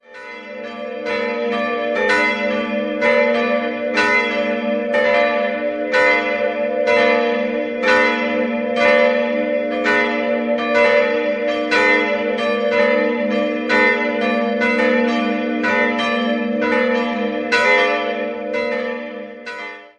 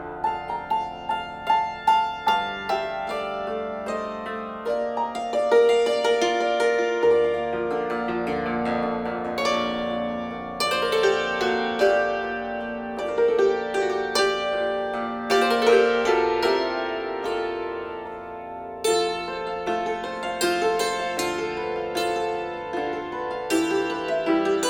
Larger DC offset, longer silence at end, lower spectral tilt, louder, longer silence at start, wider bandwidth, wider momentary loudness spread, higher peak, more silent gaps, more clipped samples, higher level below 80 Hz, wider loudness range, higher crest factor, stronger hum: neither; about the same, 0.1 s vs 0 s; about the same, -4.5 dB/octave vs -3.5 dB/octave; first, -17 LUFS vs -24 LUFS; about the same, 0.1 s vs 0 s; second, 9.6 kHz vs 19 kHz; about the same, 8 LU vs 9 LU; first, -2 dBFS vs -6 dBFS; neither; neither; about the same, -58 dBFS vs -56 dBFS; second, 2 LU vs 5 LU; about the same, 16 dB vs 18 dB; neither